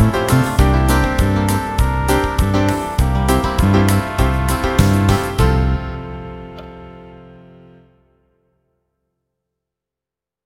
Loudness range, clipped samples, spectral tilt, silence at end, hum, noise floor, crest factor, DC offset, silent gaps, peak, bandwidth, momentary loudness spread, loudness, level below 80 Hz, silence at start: 12 LU; under 0.1%; -6 dB/octave; 3.2 s; none; -87 dBFS; 16 dB; under 0.1%; none; 0 dBFS; 16.5 kHz; 17 LU; -16 LUFS; -22 dBFS; 0 s